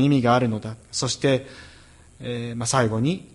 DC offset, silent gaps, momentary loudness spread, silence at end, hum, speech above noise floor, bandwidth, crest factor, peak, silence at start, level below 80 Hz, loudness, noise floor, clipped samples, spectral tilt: under 0.1%; none; 15 LU; 0.1 s; none; 27 dB; 11.5 kHz; 18 dB; -6 dBFS; 0 s; -52 dBFS; -23 LUFS; -49 dBFS; under 0.1%; -5 dB/octave